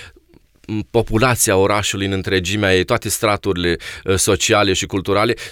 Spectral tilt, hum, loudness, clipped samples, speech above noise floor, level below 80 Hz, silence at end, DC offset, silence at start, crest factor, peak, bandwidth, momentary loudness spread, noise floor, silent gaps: -3.5 dB/octave; none; -17 LUFS; under 0.1%; 34 dB; -38 dBFS; 0 s; under 0.1%; 0 s; 16 dB; -2 dBFS; 19 kHz; 7 LU; -51 dBFS; none